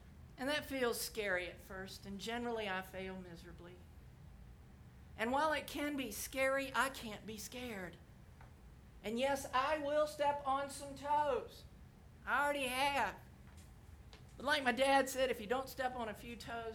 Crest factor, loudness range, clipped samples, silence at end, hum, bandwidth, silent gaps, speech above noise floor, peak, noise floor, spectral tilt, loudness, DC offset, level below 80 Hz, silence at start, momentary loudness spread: 20 dB; 6 LU; under 0.1%; 0 s; none; over 20 kHz; none; 20 dB; -18 dBFS; -59 dBFS; -3.5 dB/octave; -38 LUFS; under 0.1%; -62 dBFS; 0 s; 24 LU